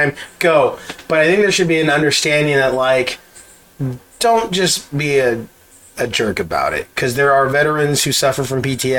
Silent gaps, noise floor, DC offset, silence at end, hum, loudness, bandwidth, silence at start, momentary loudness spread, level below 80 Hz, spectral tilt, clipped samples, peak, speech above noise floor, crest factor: none; -43 dBFS; under 0.1%; 0 s; none; -15 LUFS; 18 kHz; 0 s; 11 LU; -46 dBFS; -3.5 dB/octave; under 0.1%; 0 dBFS; 28 dB; 16 dB